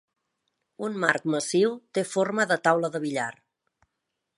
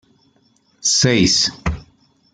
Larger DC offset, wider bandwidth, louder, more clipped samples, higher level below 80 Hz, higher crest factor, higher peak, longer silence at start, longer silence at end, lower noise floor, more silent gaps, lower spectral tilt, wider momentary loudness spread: neither; about the same, 11.5 kHz vs 11 kHz; second, -26 LUFS vs -16 LUFS; neither; second, -78 dBFS vs -38 dBFS; first, 24 dB vs 18 dB; about the same, -4 dBFS vs -2 dBFS; about the same, 0.8 s vs 0.85 s; first, 1.05 s vs 0.55 s; first, -82 dBFS vs -59 dBFS; neither; first, -4.5 dB/octave vs -3 dB/octave; second, 9 LU vs 13 LU